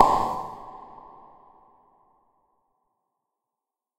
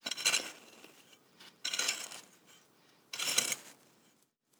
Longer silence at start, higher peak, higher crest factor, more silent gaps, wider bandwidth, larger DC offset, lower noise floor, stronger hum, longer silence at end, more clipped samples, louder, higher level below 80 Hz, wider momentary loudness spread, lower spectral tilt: about the same, 0 s vs 0.05 s; first, 0 dBFS vs -10 dBFS; about the same, 30 dB vs 28 dB; neither; second, 16 kHz vs over 20 kHz; neither; first, -88 dBFS vs -72 dBFS; neither; first, 3.15 s vs 0.85 s; neither; first, -26 LUFS vs -34 LUFS; first, -52 dBFS vs under -90 dBFS; about the same, 26 LU vs 25 LU; first, -5 dB/octave vs 1.5 dB/octave